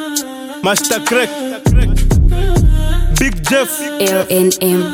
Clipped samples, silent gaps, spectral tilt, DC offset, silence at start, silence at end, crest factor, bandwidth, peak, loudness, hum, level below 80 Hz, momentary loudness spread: under 0.1%; none; -4.5 dB/octave; under 0.1%; 0 s; 0 s; 12 dB; 19 kHz; 0 dBFS; -14 LUFS; none; -16 dBFS; 6 LU